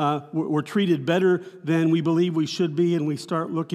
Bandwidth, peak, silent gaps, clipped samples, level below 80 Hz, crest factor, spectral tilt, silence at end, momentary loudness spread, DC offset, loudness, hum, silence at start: 12 kHz; -8 dBFS; none; under 0.1%; -80 dBFS; 14 dB; -7 dB/octave; 0 s; 6 LU; under 0.1%; -23 LUFS; none; 0 s